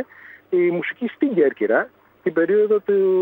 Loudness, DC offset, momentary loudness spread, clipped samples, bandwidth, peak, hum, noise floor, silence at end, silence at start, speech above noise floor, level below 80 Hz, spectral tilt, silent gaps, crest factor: -20 LUFS; under 0.1%; 9 LU; under 0.1%; 4 kHz; -4 dBFS; none; -40 dBFS; 0 s; 0 s; 22 dB; -76 dBFS; -9.5 dB/octave; none; 16 dB